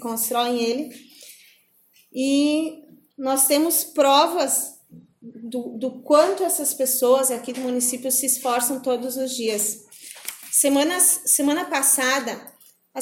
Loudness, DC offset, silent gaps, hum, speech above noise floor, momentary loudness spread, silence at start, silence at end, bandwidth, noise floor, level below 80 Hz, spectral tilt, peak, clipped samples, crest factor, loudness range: -20 LUFS; under 0.1%; none; none; 38 dB; 16 LU; 0 s; 0 s; 17 kHz; -59 dBFS; -74 dBFS; -1 dB/octave; -4 dBFS; under 0.1%; 18 dB; 4 LU